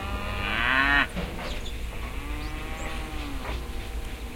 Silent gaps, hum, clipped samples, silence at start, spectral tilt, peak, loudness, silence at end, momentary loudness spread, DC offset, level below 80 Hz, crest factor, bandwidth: none; none; under 0.1%; 0 s; -4 dB/octave; -8 dBFS; -29 LUFS; 0 s; 14 LU; under 0.1%; -34 dBFS; 22 dB; 16.5 kHz